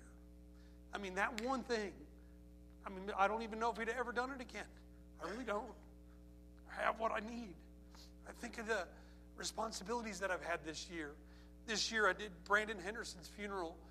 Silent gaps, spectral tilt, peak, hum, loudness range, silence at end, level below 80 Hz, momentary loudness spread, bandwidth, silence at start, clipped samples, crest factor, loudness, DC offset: none; -3 dB/octave; -20 dBFS; 60 Hz at -60 dBFS; 5 LU; 0 s; -60 dBFS; 24 LU; 15 kHz; 0 s; under 0.1%; 24 dB; -42 LUFS; under 0.1%